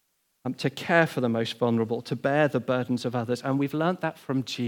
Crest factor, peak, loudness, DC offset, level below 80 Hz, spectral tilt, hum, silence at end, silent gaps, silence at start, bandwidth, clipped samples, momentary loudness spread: 22 dB; -4 dBFS; -27 LUFS; under 0.1%; -76 dBFS; -6.5 dB/octave; none; 0 s; none; 0.45 s; 18 kHz; under 0.1%; 8 LU